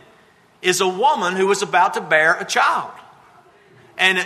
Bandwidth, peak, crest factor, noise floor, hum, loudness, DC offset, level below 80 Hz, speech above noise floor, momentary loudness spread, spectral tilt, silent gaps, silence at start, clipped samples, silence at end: 13.5 kHz; -2 dBFS; 18 dB; -53 dBFS; none; -17 LUFS; under 0.1%; -72 dBFS; 35 dB; 8 LU; -2.5 dB/octave; none; 0.65 s; under 0.1%; 0 s